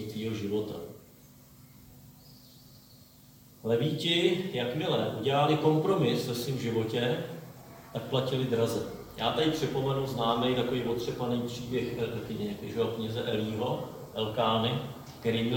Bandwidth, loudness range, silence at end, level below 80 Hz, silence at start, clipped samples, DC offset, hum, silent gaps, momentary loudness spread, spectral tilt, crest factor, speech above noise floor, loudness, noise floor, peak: 17 kHz; 6 LU; 0 s; -60 dBFS; 0 s; under 0.1%; under 0.1%; none; none; 11 LU; -6 dB/octave; 18 dB; 26 dB; -30 LUFS; -55 dBFS; -12 dBFS